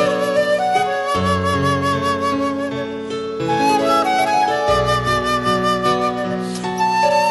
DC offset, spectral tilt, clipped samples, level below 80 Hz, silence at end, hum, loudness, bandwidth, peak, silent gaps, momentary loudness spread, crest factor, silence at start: under 0.1%; -5 dB/octave; under 0.1%; -42 dBFS; 0 s; none; -18 LUFS; 12 kHz; -4 dBFS; none; 7 LU; 14 dB; 0 s